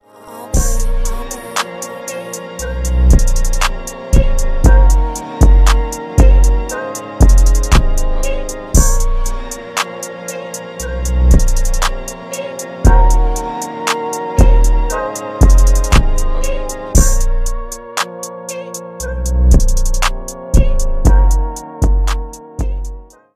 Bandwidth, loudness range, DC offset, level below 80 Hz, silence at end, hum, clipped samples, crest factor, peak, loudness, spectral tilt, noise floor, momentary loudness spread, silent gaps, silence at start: 15 kHz; 5 LU; under 0.1%; -12 dBFS; 0.3 s; none; under 0.1%; 12 dB; 0 dBFS; -16 LUFS; -5 dB/octave; -33 dBFS; 13 LU; none; 0.25 s